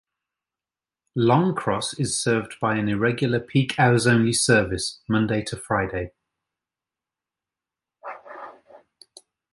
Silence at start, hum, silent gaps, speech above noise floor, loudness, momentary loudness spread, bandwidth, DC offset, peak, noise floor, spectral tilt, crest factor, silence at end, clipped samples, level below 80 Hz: 1.15 s; none; none; over 68 dB; -22 LUFS; 20 LU; 11.5 kHz; under 0.1%; -4 dBFS; under -90 dBFS; -5 dB/octave; 20 dB; 0.75 s; under 0.1%; -52 dBFS